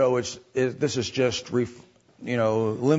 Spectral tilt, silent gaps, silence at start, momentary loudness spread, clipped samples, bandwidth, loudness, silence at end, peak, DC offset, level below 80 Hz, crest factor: -5.5 dB/octave; none; 0 s; 7 LU; under 0.1%; 8 kHz; -26 LUFS; 0 s; -8 dBFS; under 0.1%; -62 dBFS; 18 dB